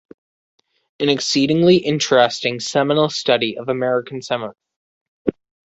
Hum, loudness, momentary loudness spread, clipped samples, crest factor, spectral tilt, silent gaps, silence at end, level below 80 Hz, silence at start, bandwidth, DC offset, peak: none; -18 LUFS; 11 LU; under 0.1%; 18 dB; -4.5 dB/octave; 4.76-5.25 s; 0.35 s; -58 dBFS; 1 s; 8.2 kHz; under 0.1%; -2 dBFS